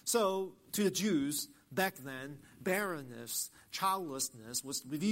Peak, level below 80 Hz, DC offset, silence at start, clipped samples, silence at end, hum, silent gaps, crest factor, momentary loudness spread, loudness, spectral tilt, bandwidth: -16 dBFS; -74 dBFS; under 0.1%; 0.05 s; under 0.1%; 0 s; none; none; 20 dB; 10 LU; -36 LUFS; -3.5 dB/octave; 16 kHz